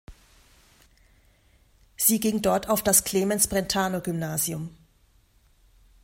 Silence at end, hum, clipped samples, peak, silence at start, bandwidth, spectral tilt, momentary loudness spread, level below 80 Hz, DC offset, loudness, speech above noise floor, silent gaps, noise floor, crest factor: 1.3 s; none; under 0.1%; -6 dBFS; 0.1 s; 16 kHz; -3.5 dB/octave; 9 LU; -52 dBFS; under 0.1%; -23 LUFS; 37 dB; none; -61 dBFS; 22 dB